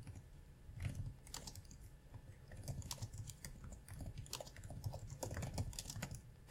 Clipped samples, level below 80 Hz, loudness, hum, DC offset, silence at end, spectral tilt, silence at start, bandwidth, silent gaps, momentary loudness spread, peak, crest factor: under 0.1%; -56 dBFS; -50 LUFS; none; under 0.1%; 0 s; -4 dB/octave; 0 s; 17 kHz; none; 13 LU; -26 dBFS; 24 dB